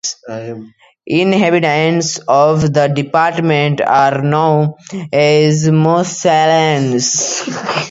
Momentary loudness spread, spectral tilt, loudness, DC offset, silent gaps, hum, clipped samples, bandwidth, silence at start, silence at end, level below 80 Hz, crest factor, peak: 8 LU; -4.5 dB/octave; -13 LUFS; under 0.1%; none; none; under 0.1%; 8 kHz; 0.05 s; 0 s; -50 dBFS; 12 dB; 0 dBFS